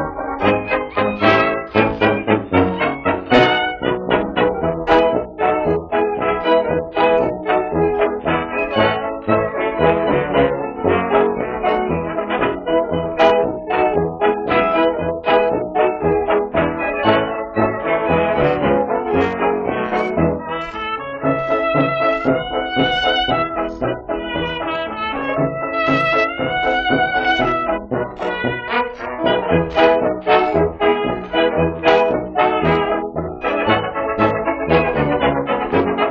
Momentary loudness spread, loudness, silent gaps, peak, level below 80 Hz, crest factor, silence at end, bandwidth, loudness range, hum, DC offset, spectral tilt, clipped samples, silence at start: 7 LU; -17 LUFS; none; 0 dBFS; -42 dBFS; 16 dB; 0 s; 7 kHz; 3 LU; none; under 0.1%; -3.5 dB/octave; under 0.1%; 0 s